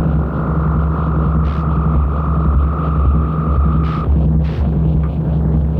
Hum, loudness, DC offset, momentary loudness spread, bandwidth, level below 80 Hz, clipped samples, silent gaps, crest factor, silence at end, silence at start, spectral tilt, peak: none; -16 LUFS; under 0.1%; 2 LU; 4 kHz; -18 dBFS; under 0.1%; none; 10 dB; 0 s; 0 s; -11.5 dB/octave; -4 dBFS